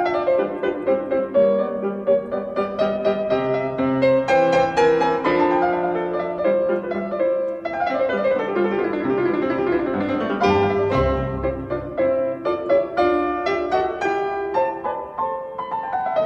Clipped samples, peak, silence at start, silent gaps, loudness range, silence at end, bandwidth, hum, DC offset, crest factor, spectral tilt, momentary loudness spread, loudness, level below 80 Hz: under 0.1%; -4 dBFS; 0 s; none; 3 LU; 0 s; 8.2 kHz; none; under 0.1%; 16 dB; -7 dB/octave; 7 LU; -21 LUFS; -44 dBFS